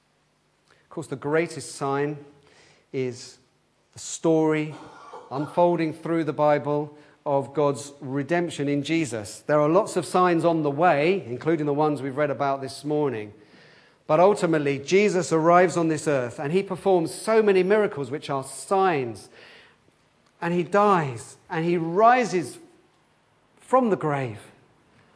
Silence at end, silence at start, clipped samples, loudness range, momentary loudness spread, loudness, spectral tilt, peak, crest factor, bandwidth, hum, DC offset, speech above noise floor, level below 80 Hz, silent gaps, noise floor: 0.7 s; 0.9 s; under 0.1%; 7 LU; 15 LU; -23 LUFS; -6 dB/octave; -4 dBFS; 20 dB; 11 kHz; none; under 0.1%; 43 dB; -72 dBFS; none; -66 dBFS